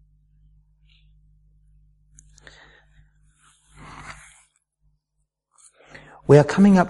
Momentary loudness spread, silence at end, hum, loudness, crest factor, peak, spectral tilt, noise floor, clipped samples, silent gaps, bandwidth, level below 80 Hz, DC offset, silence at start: 29 LU; 0 s; none; -16 LUFS; 22 dB; -2 dBFS; -8 dB/octave; -76 dBFS; under 0.1%; none; 11 kHz; -54 dBFS; under 0.1%; 6.3 s